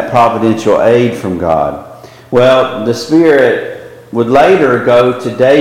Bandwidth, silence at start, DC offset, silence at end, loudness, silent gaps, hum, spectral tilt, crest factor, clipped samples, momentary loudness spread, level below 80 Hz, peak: 16 kHz; 0 s; under 0.1%; 0 s; -10 LUFS; none; none; -6 dB/octave; 10 dB; under 0.1%; 10 LU; -42 dBFS; 0 dBFS